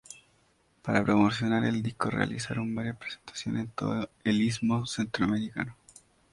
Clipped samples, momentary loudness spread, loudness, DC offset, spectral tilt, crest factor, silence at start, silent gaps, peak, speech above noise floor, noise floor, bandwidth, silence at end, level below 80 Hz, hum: under 0.1%; 13 LU; -30 LUFS; under 0.1%; -5.5 dB/octave; 20 dB; 0.1 s; none; -8 dBFS; 38 dB; -67 dBFS; 11.5 kHz; 0.6 s; -58 dBFS; none